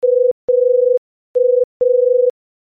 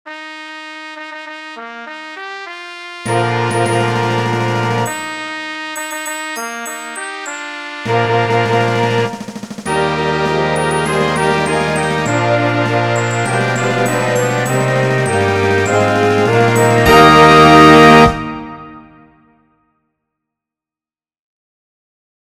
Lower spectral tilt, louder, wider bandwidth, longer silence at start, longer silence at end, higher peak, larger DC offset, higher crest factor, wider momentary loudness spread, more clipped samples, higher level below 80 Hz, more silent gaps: first, -8 dB/octave vs -5 dB/octave; about the same, -15 LUFS vs -13 LUFS; second, 1 kHz vs 15.5 kHz; about the same, 0 s vs 0.05 s; second, 0.3 s vs 3.45 s; second, -6 dBFS vs 0 dBFS; neither; second, 8 dB vs 14 dB; second, 6 LU vs 22 LU; second, under 0.1% vs 0.6%; second, -66 dBFS vs -40 dBFS; first, 0.31-0.48 s, 0.98-1.34 s, 1.64-1.80 s vs none